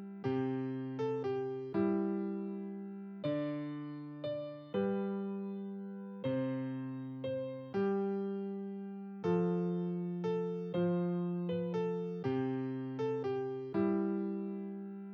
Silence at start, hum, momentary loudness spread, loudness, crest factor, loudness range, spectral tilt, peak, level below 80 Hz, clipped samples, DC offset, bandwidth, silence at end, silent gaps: 0 s; none; 9 LU; -37 LUFS; 14 dB; 3 LU; -9.5 dB/octave; -22 dBFS; -78 dBFS; under 0.1%; under 0.1%; 6.4 kHz; 0 s; none